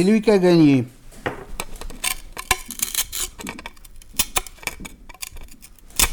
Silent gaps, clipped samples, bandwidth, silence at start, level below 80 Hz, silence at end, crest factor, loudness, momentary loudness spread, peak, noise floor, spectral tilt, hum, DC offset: none; under 0.1%; over 20 kHz; 0 s; -38 dBFS; 0 s; 20 dB; -21 LUFS; 20 LU; -2 dBFS; -43 dBFS; -4 dB/octave; none; under 0.1%